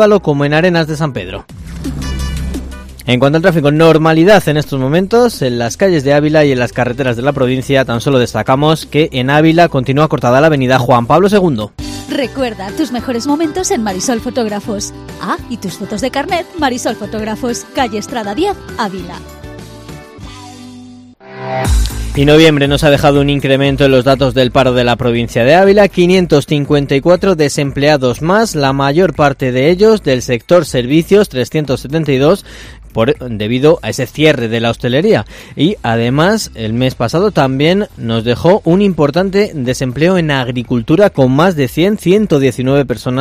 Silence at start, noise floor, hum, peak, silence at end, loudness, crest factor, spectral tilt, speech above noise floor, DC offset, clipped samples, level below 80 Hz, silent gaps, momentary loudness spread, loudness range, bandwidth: 0 s; -35 dBFS; none; 0 dBFS; 0 s; -12 LUFS; 12 dB; -6 dB/octave; 24 dB; under 0.1%; 0.5%; -30 dBFS; none; 12 LU; 8 LU; 16 kHz